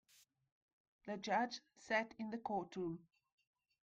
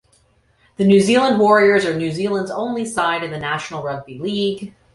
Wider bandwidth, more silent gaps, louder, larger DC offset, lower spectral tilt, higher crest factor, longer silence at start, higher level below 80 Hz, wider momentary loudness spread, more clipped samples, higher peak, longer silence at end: first, 15.5 kHz vs 11.5 kHz; neither; second, -43 LUFS vs -18 LUFS; neither; about the same, -4.5 dB/octave vs -5.5 dB/octave; about the same, 20 dB vs 16 dB; first, 1.05 s vs 0.8 s; second, -80 dBFS vs -56 dBFS; about the same, 13 LU vs 13 LU; neither; second, -26 dBFS vs -2 dBFS; first, 0.8 s vs 0.25 s